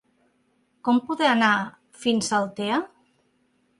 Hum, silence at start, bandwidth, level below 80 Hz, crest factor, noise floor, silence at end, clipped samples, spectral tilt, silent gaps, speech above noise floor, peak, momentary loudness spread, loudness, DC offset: none; 0.85 s; 11.5 kHz; -70 dBFS; 18 dB; -67 dBFS; 0.95 s; under 0.1%; -3.5 dB/octave; none; 45 dB; -8 dBFS; 11 LU; -23 LUFS; under 0.1%